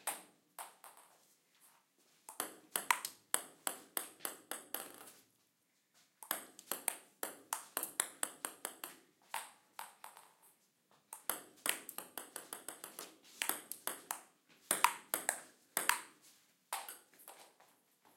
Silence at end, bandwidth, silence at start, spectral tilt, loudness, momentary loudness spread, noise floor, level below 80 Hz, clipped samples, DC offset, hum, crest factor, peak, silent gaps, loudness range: 0.55 s; 16.5 kHz; 0 s; 1 dB/octave; -41 LUFS; 20 LU; -79 dBFS; under -90 dBFS; under 0.1%; under 0.1%; none; 36 dB; -10 dBFS; none; 7 LU